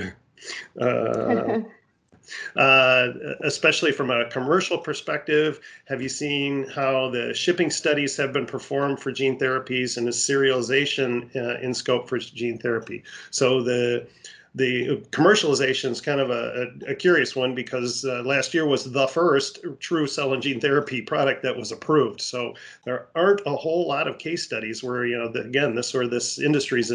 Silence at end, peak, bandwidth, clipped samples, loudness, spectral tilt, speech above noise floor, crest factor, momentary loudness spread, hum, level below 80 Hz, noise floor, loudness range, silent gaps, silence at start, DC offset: 0 s; -4 dBFS; 11 kHz; under 0.1%; -23 LUFS; -4 dB/octave; 36 dB; 20 dB; 10 LU; none; -66 dBFS; -59 dBFS; 4 LU; none; 0 s; under 0.1%